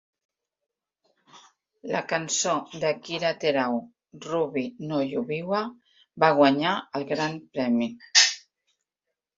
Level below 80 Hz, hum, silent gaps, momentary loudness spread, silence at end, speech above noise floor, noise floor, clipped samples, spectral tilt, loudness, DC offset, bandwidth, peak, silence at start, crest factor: -72 dBFS; none; none; 12 LU; 1 s; 60 dB; -85 dBFS; under 0.1%; -3 dB/octave; -25 LUFS; under 0.1%; 7.8 kHz; -4 dBFS; 1.35 s; 24 dB